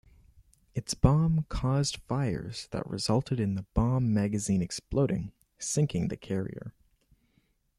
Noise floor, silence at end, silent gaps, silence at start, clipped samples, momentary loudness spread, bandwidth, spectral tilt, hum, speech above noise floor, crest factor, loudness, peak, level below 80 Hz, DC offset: -71 dBFS; 1.1 s; none; 0.75 s; under 0.1%; 12 LU; 13 kHz; -6 dB/octave; none; 42 dB; 24 dB; -30 LUFS; -6 dBFS; -44 dBFS; under 0.1%